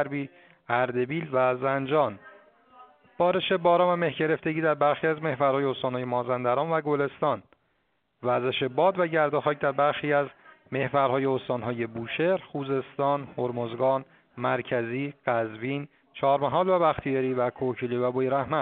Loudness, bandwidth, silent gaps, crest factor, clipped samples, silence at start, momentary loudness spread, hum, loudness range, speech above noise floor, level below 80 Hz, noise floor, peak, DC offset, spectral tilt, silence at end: -27 LUFS; 4.5 kHz; none; 18 dB; under 0.1%; 0 s; 7 LU; none; 4 LU; 47 dB; -64 dBFS; -73 dBFS; -8 dBFS; under 0.1%; -4.5 dB/octave; 0 s